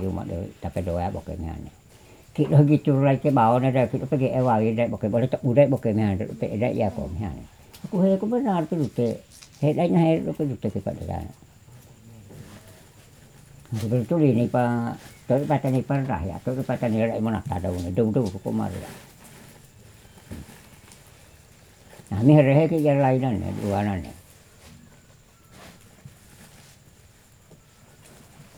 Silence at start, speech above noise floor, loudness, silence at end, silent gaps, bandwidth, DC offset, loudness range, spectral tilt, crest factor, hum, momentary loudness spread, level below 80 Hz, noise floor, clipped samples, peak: 0 s; 31 dB; -23 LUFS; 0.15 s; none; 15.5 kHz; under 0.1%; 11 LU; -8.5 dB/octave; 20 dB; none; 17 LU; -50 dBFS; -53 dBFS; under 0.1%; -4 dBFS